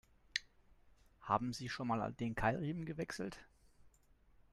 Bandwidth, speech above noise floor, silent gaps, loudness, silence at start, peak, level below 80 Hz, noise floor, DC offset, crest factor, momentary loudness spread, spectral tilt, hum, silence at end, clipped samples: 13 kHz; 29 dB; none; -41 LUFS; 0.35 s; -18 dBFS; -62 dBFS; -69 dBFS; under 0.1%; 24 dB; 9 LU; -5.5 dB/octave; none; 0.65 s; under 0.1%